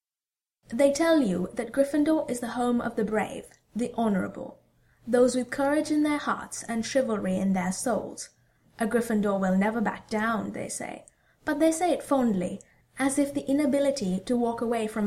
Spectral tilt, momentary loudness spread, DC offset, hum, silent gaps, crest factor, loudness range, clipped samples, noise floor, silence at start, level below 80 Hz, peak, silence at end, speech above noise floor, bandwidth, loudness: -5.5 dB/octave; 12 LU; under 0.1%; none; none; 18 dB; 2 LU; under 0.1%; under -90 dBFS; 0.7 s; -58 dBFS; -10 dBFS; 0 s; over 64 dB; 15.5 kHz; -27 LUFS